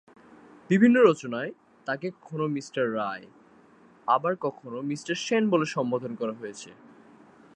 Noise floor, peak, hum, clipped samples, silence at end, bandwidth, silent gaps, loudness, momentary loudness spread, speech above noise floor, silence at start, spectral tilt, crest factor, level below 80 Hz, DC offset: -56 dBFS; -6 dBFS; none; under 0.1%; 0.8 s; 9.4 kHz; none; -26 LUFS; 18 LU; 30 dB; 0.7 s; -6 dB/octave; 20 dB; -76 dBFS; under 0.1%